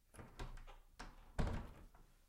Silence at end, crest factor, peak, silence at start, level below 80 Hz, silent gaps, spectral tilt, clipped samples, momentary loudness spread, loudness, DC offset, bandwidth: 0 s; 24 dB; -24 dBFS; 0.15 s; -50 dBFS; none; -6 dB/octave; under 0.1%; 18 LU; -50 LUFS; under 0.1%; 15.5 kHz